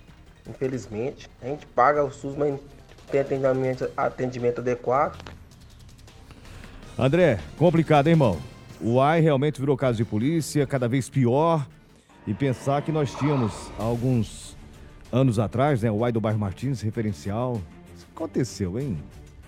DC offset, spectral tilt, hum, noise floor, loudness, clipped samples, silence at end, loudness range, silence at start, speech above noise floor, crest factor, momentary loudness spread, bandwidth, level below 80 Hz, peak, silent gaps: under 0.1%; -7 dB/octave; none; -52 dBFS; -24 LUFS; under 0.1%; 0.05 s; 6 LU; 0.2 s; 28 dB; 20 dB; 15 LU; 14 kHz; -48 dBFS; -6 dBFS; none